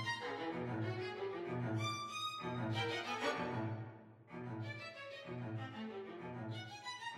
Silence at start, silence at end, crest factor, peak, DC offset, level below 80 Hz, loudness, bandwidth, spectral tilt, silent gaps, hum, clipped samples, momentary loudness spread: 0 s; 0 s; 18 dB; -26 dBFS; under 0.1%; -76 dBFS; -43 LUFS; 14 kHz; -5 dB/octave; none; none; under 0.1%; 9 LU